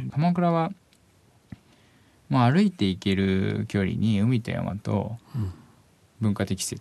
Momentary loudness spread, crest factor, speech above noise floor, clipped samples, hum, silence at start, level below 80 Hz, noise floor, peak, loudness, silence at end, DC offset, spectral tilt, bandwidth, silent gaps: 11 LU; 16 dB; 36 dB; under 0.1%; none; 0 s; -60 dBFS; -60 dBFS; -10 dBFS; -25 LUFS; 0 s; under 0.1%; -6.5 dB/octave; 13 kHz; none